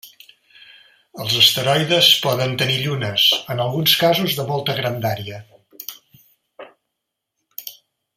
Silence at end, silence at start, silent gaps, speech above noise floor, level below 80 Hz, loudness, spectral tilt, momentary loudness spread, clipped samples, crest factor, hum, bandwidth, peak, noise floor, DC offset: 0.45 s; 0.05 s; none; 61 dB; -60 dBFS; -16 LUFS; -3.5 dB/octave; 21 LU; under 0.1%; 22 dB; none; 16 kHz; 0 dBFS; -79 dBFS; under 0.1%